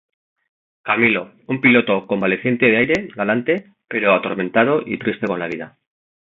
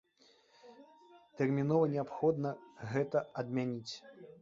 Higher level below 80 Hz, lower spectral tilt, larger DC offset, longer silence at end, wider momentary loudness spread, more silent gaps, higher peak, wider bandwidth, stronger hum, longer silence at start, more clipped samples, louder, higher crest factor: first, -58 dBFS vs -76 dBFS; about the same, -7 dB/octave vs -7.5 dB/octave; neither; first, 0.6 s vs 0.1 s; second, 12 LU vs 16 LU; neither; first, -2 dBFS vs -16 dBFS; about the same, 7.4 kHz vs 7.6 kHz; neither; first, 0.85 s vs 0.65 s; neither; first, -18 LUFS vs -35 LUFS; about the same, 18 dB vs 20 dB